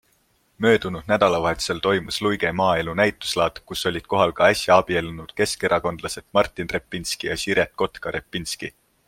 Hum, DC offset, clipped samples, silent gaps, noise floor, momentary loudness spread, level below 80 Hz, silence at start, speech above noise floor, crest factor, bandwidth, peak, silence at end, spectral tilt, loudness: none; under 0.1%; under 0.1%; none; -64 dBFS; 10 LU; -50 dBFS; 0.6 s; 42 dB; 20 dB; 16.5 kHz; -2 dBFS; 0.4 s; -4 dB/octave; -22 LUFS